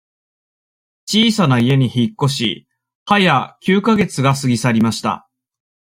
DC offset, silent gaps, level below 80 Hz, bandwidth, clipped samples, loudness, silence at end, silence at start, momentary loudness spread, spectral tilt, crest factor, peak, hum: under 0.1%; 2.95-3.06 s; -54 dBFS; 16 kHz; under 0.1%; -16 LUFS; 0.75 s; 1.05 s; 9 LU; -5.5 dB/octave; 16 dB; -2 dBFS; none